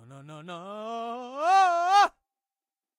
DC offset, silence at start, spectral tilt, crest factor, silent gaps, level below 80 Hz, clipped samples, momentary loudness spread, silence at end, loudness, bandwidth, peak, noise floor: under 0.1%; 0.1 s; -2.5 dB/octave; 16 dB; none; -78 dBFS; under 0.1%; 19 LU; 0.9 s; -24 LUFS; 12 kHz; -10 dBFS; under -90 dBFS